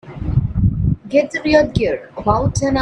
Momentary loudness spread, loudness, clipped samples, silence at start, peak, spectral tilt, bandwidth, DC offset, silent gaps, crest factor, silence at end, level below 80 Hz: 6 LU; -17 LUFS; under 0.1%; 0.05 s; 0 dBFS; -6.5 dB/octave; 10.5 kHz; under 0.1%; none; 16 dB; 0 s; -28 dBFS